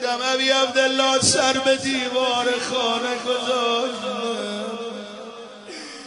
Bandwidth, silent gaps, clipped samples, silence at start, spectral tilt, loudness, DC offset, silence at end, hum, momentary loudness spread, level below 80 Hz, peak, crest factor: 10.5 kHz; none; under 0.1%; 0 s; -2 dB/octave; -20 LUFS; under 0.1%; 0 s; none; 18 LU; -62 dBFS; -4 dBFS; 18 dB